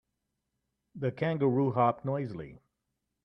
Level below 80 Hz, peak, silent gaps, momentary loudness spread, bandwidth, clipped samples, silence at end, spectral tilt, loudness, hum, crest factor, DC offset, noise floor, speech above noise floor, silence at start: -68 dBFS; -12 dBFS; none; 14 LU; 5.8 kHz; under 0.1%; 0.7 s; -10.5 dB/octave; -30 LUFS; none; 20 dB; under 0.1%; -84 dBFS; 54 dB; 0.95 s